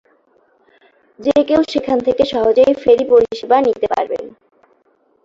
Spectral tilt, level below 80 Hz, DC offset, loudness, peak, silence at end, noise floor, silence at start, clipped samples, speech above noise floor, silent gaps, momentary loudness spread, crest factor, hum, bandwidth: -5.5 dB/octave; -50 dBFS; under 0.1%; -15 LUFS; -2 dBFS; 0.95 s; -58 dBFS; 1.2 s; under 0.1%; 44 dB; none; 10 LU; 14 dB; none; 7.6 kHz